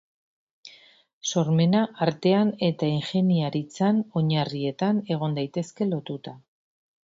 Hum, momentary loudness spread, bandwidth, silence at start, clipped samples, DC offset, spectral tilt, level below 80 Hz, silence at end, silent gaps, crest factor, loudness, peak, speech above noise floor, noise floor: none; 9 LU; 7.8 kHz; 0.65 s; under 0.1%; under 0.1%; -6.5 dB/octave; -66 dBFS; 0.65 s; 1.13-1.21 s; 20 dB; -25 LUFS; -6 dBFS; 31 dB; -55 dBFS